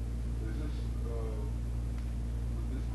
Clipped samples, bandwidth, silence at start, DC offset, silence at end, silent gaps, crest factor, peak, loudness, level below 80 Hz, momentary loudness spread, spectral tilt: under 0.1%; 12 kHz; 0 s; under 0.1%; 0 s; none; 10 dB; -26 dBFS; -38 LUFS; -36 dBFS; 1 LU; -7.5 dB/octave